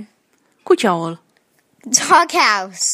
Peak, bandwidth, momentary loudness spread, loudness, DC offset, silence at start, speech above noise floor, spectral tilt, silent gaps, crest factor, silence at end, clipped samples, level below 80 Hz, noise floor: 0 dBFS; 15.5 kHz; 12 LU; -15 LUFS; under 0.1%; 0 s; 45 dB; -2 dB/octave; none; 18 dB; 0 s; under 0.1%; -70 dBFS; -61 dBFS